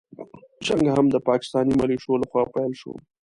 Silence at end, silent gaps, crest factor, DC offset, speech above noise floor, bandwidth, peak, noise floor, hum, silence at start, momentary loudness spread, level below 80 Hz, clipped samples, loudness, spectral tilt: 0.25 s; none; 16 dB; under 0.1%; 21 dB; 11.5 kHz; -6 dBFS; -43 dBFS; none; 0.2 s; 18 LU; -52 dBFS; under 0.1%; -22 LUFS; -6.5 dB/octave